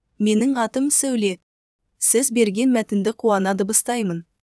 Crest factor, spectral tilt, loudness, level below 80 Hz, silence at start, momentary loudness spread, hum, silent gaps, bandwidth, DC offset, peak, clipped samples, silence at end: 16 dB; -4 dB/octave; -19 LUFS; -66 dBFS; 0.2 s; 7 LU; none; 1.43-1.79 s; 11 kHz; under 0.1%; -4 dBFS; under 0.1%; 0.3 s